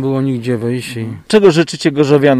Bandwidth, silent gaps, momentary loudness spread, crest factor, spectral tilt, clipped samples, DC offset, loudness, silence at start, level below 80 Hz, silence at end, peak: 14 kHz; none; 11 LU; 12 dB; -6 dB/octave; under 0.1%; under 0.1%; -14 LUFS; 0 s; -52 dBFS; 0 s; 0 dBFS